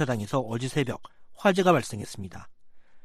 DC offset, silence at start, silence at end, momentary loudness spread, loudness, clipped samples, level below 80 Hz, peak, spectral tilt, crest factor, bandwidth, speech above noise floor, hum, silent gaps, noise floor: under 0.1%; 0 s; 0.05 s; 17 LU; -26 LUFS; under 0.1%; -60 dBFS; -6 dBFS; -5.5 dB/octave; 22 dB; 15 kHz; 20 dB; none; none; -46 dBFS